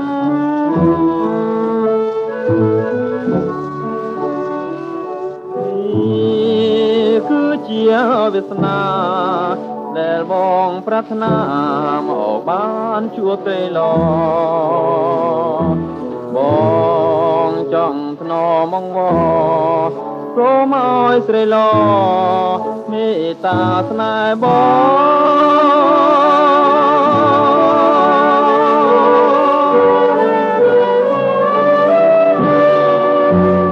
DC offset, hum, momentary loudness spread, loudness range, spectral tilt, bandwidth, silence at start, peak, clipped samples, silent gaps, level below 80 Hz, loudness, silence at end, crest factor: under 0.1%; none; 10 LU; 7 LU; -8 dB/octave; 7.4 kHz; 0 s; -2 dBFS; under 0.1%; none; -50 dBFS; -13 LUFS; 0 s; 12 dB